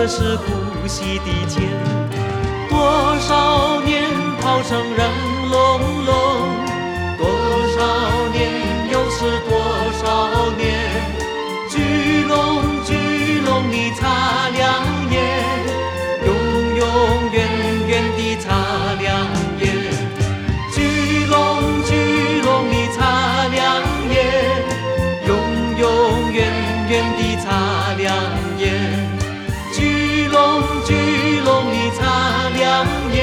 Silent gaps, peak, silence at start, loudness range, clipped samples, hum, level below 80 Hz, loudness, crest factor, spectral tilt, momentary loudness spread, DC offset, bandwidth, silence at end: none; -2 dBFS; 0 s; 3 LU; under 0.1%; none; -30 dBFS; -17 LUFS; 16 dB; -5 dB/octave; 6 LU; under 0.1%; 17 kHz; 0 s